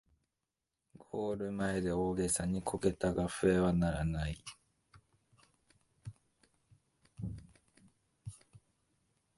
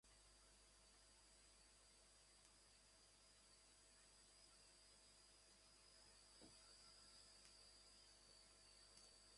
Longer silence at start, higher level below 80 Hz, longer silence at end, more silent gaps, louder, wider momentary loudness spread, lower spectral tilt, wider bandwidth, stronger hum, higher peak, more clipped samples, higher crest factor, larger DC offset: first, 1.15 s vs 0.05 s; first, -52 dBFS vs -80 dBFS; first, 0.8 s vs 0 s; neither; first, -35 LUFS vs -68 LUFS; first, 22 LU vs 4 LU; first, -6 dB/octave vs -1 dB/octave; about the same, 11.5 kHz vs 11.5 kHz; second, none vs 50 Hz at -80 dBFS; first, -16 dBFS vs -46 dBFS; neither; about the same, 22 dB vs 24 dB; neither